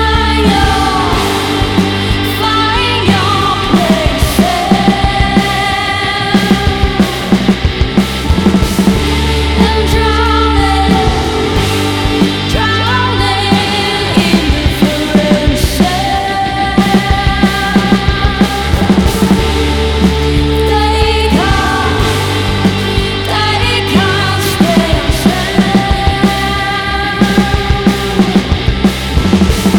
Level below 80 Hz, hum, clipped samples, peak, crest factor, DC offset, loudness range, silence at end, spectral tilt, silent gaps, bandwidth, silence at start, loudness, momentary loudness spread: -18 dBFS; none; under 0.1%; 0 dBFS; 10 dB; under 0.1%; 1 LU; 0 s; -5 dB/octave; none; 19 kHz; 0 s; -11 LUFS; 3 LU